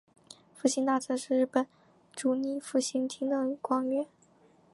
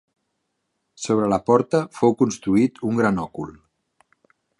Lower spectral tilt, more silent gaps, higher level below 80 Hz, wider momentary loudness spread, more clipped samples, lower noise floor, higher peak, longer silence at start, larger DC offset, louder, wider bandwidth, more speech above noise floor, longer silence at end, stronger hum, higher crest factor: second, -3 dB/octave vs -6.5 dB/octave; neither; second, -84 dBFS vs -56 dBFS; second, 6 LU vs 14 LU; neither; second, -63 dBFS vs -75 dBFS; second, -12 dBFS vs -2 dBFS; second, 0.3 s vs 1 s; neither; second, -31 LUFS vs -21 LUFS; about the same, 11.5 kHz vs 11 kHz; second, 33 dB vs 55 dB; second, 0.7 s vs 1.1 s; neither; about the same, 20 dB vs 20 dB